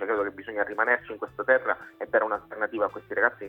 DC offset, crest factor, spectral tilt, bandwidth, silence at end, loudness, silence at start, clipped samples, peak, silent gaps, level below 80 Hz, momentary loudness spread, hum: under 0.1%; 20 dB; -7 dB/octave; 4 kHz; 0 s; -27 LUFS; 0 s; under 0.1%; -8 dBFS; none; -66 dBFS; 8 LU; none